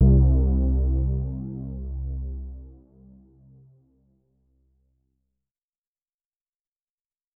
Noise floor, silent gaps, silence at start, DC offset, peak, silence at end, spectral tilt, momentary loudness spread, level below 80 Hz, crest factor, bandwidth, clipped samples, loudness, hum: under -90 dBFS; none; 0 s; under 0.1%; -10 dBFS; 4.65 s; -16 dB/octave; 18 LU; -28 dBFS; 16 dB; 1.2 kHz; under 0.1%; -25 LUFS; none